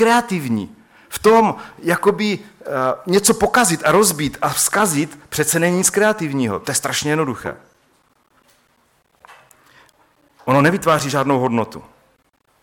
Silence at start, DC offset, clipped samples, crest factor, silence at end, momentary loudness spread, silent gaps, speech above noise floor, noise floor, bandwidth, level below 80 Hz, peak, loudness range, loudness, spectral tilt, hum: 0 s; under 0.1%; under 0.1%; 16 dB; 0.85 s; 11 LU; none; 44 dB; -61 dBFS; 17.5 kHz; -52 dBFS; -4 dBFS; 9 LU; -17 LUFS; -4 dB/octave; none